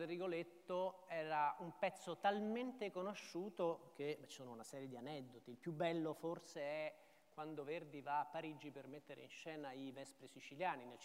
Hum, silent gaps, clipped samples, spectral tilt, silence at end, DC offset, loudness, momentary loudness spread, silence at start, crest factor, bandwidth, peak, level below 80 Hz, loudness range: none; none; under 0.1%; -5.5 dB/octave; 0 s; under 0.1%; -46 LUFS; 14 LU; 0 s; 20 dB; 16 kHz; -26 dBFS; under -90 dBFS; 6 LU